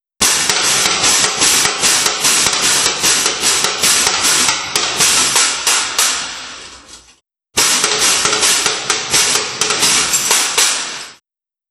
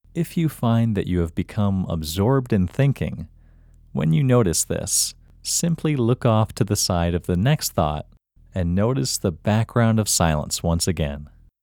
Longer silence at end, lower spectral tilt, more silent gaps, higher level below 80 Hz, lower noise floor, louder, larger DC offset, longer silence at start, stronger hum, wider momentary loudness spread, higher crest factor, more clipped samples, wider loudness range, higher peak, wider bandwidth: first, 0.55 s vs 0.35 s; second, 1 dB/octave vs -5 dB/octave; neither; second, -48 dBFS vs -40 dBFS; first, -89 dBFS vs -50 dBFS; first, -11 LUFS vs -21 LUFS; neither; about the same, 0.2 s vs 0.15 s; neither; second, 5 LU vs 8 LU; about the same, 14 dB vs 18 dB; neither; about the same, 3 LU vs 2 LU; first, 0 dBFS vs -4 dBFS; about the same, 20 kHz vs 20 kHz